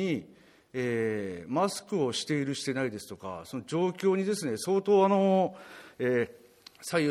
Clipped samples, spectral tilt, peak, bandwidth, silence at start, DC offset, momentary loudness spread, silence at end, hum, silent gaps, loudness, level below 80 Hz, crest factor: under 0.1%; -5.5 dB/octave; -12 dBFS; 14.5 kHz; 0 s; under 0.1%; 16 LU; 0 s; none; none; -29 LUFS; -72 dBFS; 18 dB